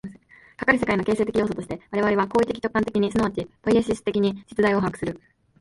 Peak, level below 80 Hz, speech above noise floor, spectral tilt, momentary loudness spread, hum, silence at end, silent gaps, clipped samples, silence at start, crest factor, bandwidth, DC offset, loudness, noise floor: -4 dBFS; -50 dBFS; 27 dB; -6.5 dB/octave; 8 LU; none; 0.45 s; none; under 0.1%; 0.05 s; 20 dB; 11.5 kHz; under 0.1%; -23 LUFS; -49 dBFS